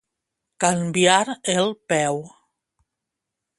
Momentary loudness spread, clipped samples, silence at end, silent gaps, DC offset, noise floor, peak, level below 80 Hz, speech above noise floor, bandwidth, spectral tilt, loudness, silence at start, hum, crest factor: 7 LU; under 0.1%; 1.3 s; none; under 0.1%; -83 dBFS; -2 dBFS; -64 dBFS; 63 dB; 11.5 kHz; -3.5 dB/octave; -21 LUFS; 0.6 s; none; 22 dB